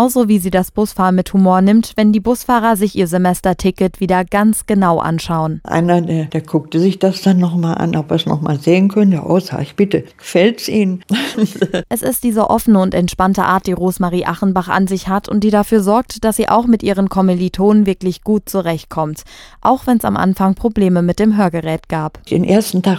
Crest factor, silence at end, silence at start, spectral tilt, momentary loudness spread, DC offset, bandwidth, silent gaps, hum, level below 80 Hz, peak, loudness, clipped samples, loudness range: 14 dB; 0 s; 0 s; -6.5 dB/octave; 6 LU; under 0.1%; 17 kHz; none; none; -40 dBFS; 0 dBFS; -14 LUFS; under 0.1%; 2 LU